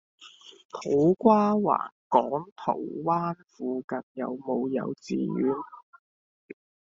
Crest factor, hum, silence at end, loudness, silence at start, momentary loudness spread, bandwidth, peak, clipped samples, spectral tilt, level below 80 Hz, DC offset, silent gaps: 22 dB; none; 1.1 s; -27 LUFS; 0.2 s; 14 LU; 7.6 kHz; -4 dBFS; under 0.1%; -7 dB/octave; -70 dBFS; under 0.1%; 0.65-0.69 s, 1.92-2.10 s, 2.52-2.56 s, 3.84-3.88 s, 4.03-4.15 s